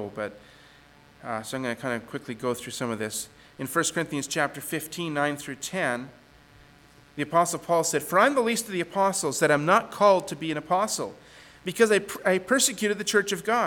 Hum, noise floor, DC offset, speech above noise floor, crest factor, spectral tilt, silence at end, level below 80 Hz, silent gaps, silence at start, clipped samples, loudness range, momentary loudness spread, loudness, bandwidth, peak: none; -54 dBFS; under 0.1%; 28 dB; 20 dB; -3.5 dB/octave; 0 s; -64 dBFS; none; 0 s; under 0.1%; 7 LU; 13 LU; -26 LUFS; 19 kHz; -6 dBFS